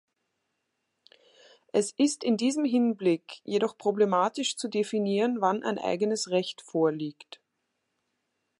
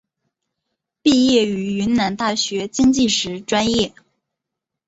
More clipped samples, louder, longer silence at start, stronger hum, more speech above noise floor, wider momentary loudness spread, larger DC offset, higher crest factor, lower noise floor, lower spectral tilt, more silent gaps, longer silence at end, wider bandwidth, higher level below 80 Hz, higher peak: neither; second, -28 LUFS vs -18 LUFS; first, 1.75 s vs 1.05 s; neither; second, 53 dB vs 65 dB; about the same, 5 LU vs 6 LU; neither; about the same, 18 dB vs 16 dB; about the same, -80 dBFS vs -83 dBFS; about the same, -4.5 dB/octave vs -4 dB/octave; neither; first, 1.5 s vs 1 s; first, 11.5 kHz vs 8 kHz; second, -80 dBFS vs -48 dBFS; second, -10 dBFS vs -2 dBFS